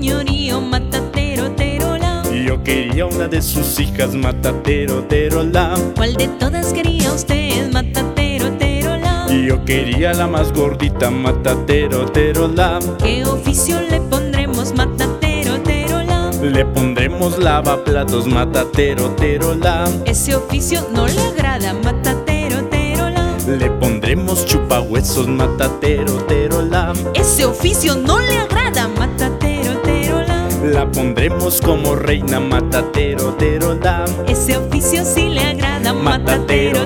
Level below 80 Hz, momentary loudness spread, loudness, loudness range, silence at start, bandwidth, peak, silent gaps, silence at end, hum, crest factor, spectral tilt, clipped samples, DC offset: -22 dBFS; 3 LU; -16 LUFS; 2 LU; 0 s; 18 kHz; 0 dBFS; none; 0 s; none; 14 dB; -5 dB/octave; under 0.1%; under 0.1%